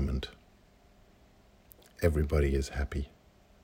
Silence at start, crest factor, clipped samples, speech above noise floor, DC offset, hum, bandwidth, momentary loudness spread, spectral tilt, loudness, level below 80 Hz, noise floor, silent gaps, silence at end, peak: 0 s; 22 dB; under 0.1%; 32 dB; under 0.1%; none; 16 kHz; 16 LU; -6.5 dB/octave; -32 LUFS; -38 dBFS; -61 dBFS; none; 0.55 s; -12 dBFS